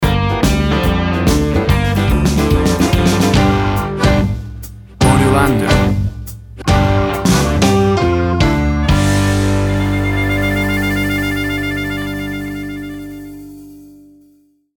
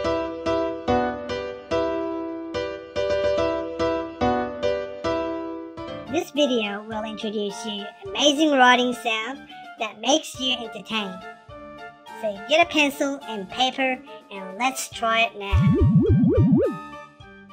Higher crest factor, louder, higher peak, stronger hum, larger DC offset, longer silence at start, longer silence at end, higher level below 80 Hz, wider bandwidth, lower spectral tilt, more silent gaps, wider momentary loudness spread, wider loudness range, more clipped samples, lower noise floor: second, 14 dB vs 22 dB; first, -14 LUFS vs -23 LUFS; about the same, 0 dBFS vs -2 dBFS; first, 50 Hz at -40 dBFS vs none; neither; about the same, 0 s vs 0 s; first, 0.9 s vs 0 s; first, -22 dBFS vs -40 dBFS; first, 19.5 kHz vs 16 kHz; about the same, -6 dB/octave vs -5 dB/octave; neither; second, 13 LU vs 17 LU; about the same, 6 LU vs 5 LU; neither; first, -52 dBFS vs -45 dBFS